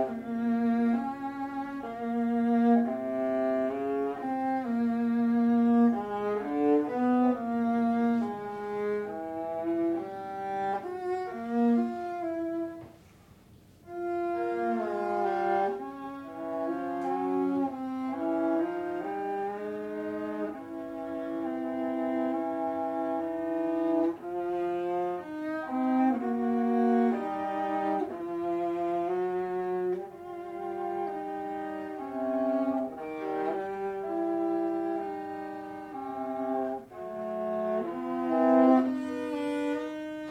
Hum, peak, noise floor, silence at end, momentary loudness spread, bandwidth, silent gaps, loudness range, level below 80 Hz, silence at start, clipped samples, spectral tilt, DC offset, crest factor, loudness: none; -12 dBFS; -56 dBFS; 0 s; 11 LU; 8 kHz; none; 6 LU; -70 dBFS; 0 s; under 0.1%; -7.5 dB/octave; under 0.1%; 18 dB; -30 LUFS